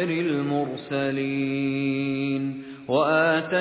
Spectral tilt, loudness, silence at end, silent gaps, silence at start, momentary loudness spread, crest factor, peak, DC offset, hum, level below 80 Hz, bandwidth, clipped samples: -10.5 dB/octave; -25 LUFS; 0 s; none; 0 s; 8 LU; 14 dB; -10 dBFS; under 0.1%; none; -66 dBFS; 4 kHz; under 0.1%